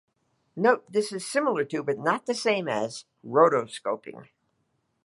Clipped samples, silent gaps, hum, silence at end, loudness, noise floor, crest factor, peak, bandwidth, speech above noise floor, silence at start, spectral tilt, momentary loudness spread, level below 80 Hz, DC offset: under 0.1%; none; none; 0.8 s; -26 LUFS; -74 dBFS; 22 dB; -6 dBFS; 11.5 kHz; 48 dB; 0.55 s; -4.5 dB/octave; 13 LU; -78 dBFS; under 0.1%